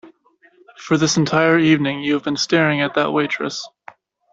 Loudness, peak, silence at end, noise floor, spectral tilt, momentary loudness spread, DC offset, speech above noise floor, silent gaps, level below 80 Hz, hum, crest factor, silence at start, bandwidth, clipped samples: -17 LUFS; -2 dBFS; 0.65 s; -55 dBFS; -4.5 dB/octave; 11 LU; under 0.1%; 38 dB; none; -58 dBFS; none; 16 dB; 0.05 s; 7.8 kHz; under 0.1%